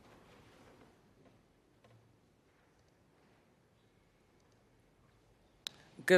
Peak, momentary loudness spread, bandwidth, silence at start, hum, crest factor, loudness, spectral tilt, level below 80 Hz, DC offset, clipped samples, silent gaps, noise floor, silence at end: -12 dBFS; 22 LU; 13.5 kHz; 6.05 s; none; 30 dB; -50 LUFS; -4.5 dB/octave; -78 dBFS; under 0.1%; under 0.1%; none; -70 dBFS; 0 s